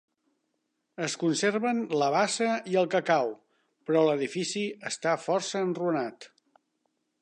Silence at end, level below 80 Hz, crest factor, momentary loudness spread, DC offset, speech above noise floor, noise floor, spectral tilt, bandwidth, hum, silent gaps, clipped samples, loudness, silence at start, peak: 0.95 s; -82 dBFS; 18 dB; 8 LU; under 0.1%; 51 dB; -79 dBFS; -4 dB/octave; 11 kHz; none; none; under 0.1%; -28 LUFS; 1 s; -10 dBFS